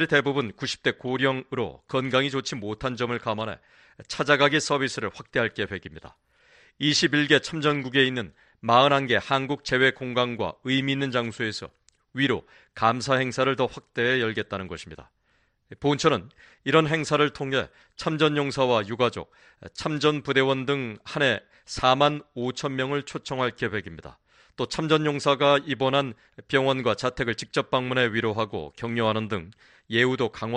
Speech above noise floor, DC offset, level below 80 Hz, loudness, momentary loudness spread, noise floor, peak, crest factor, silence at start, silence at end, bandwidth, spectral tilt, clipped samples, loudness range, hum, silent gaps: 43 dB; under 0.1%; -58 dBFS; -25 LUFS; 12 LU; -68 dBFS; -4 dBFS; 20 dB; 0 s; 0 s; 10.5 kHz; -4.5 dB/octave; under 0.1%; 4 LU; none; none